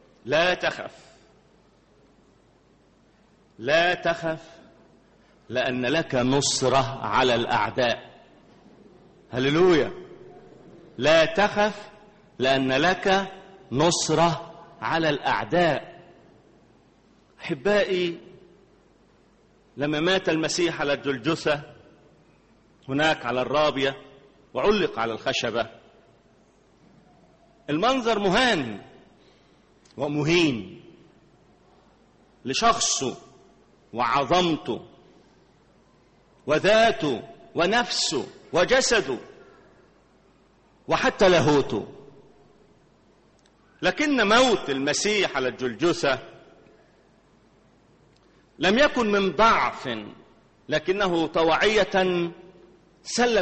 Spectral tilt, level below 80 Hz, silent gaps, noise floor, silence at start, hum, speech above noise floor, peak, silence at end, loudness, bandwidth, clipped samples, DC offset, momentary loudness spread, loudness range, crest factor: -4 dB/octave; -52 dBFS; none; -59 dBFS; 0.25 s; none; 36 dB; -6 dBFS; 0 s; -23 LUFS; 8.4 kHz; under 0.1%; under 0.1%; 15 LU; 6 LU; 20 dB